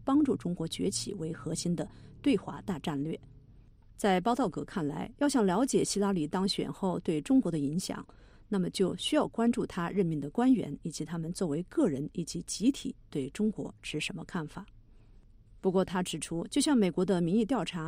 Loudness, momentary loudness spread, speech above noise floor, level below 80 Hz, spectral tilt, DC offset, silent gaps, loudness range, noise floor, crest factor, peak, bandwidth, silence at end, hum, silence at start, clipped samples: -31 LUFS; 10 LU; 26 dB; -56 dBFS; -5.5 dB/octave; under 0.1%; none; 5 LU; -56 dBFS; 16 dB; -14 dBFS; 15.5 kHz; 0 s; none; 0 s; under 0.1%